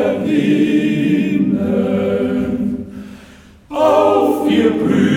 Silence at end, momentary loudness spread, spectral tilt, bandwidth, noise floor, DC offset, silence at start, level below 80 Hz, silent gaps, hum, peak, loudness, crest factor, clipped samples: 0 s; 12 LU; -7.5 dB/octave; 16 kHz; -42 dBFS; under 0.1%; 0 s; -46 dBFS; none; none; -2 dBFS; -15 LUFS; 14 dB; under 0.1%